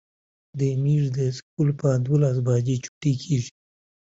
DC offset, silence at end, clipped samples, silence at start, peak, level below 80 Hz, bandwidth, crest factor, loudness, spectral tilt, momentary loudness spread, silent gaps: under 0.1%; 0.65 s; under 0.1%; 0.55 s; -8 dBFS; -58 dBFS; 7.8 kHz; 14 dB; -24 LUFS; -7.5 dB/octave; 6 LU; 1.43-1.57 s, 2.88-3.01 s